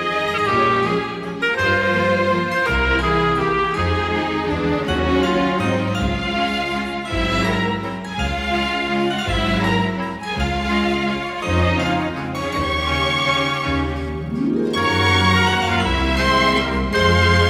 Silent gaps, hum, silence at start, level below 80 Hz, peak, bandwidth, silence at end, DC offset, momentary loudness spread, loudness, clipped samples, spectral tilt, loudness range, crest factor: none; none; 0 s; -32 dBFS; -4 dBFS; 14.5 kHz; 0 s; under 0.1%; 7 LU; -19 LUFS; under 0.1%; -5.5 dB/octave; 3 LU; 14 dB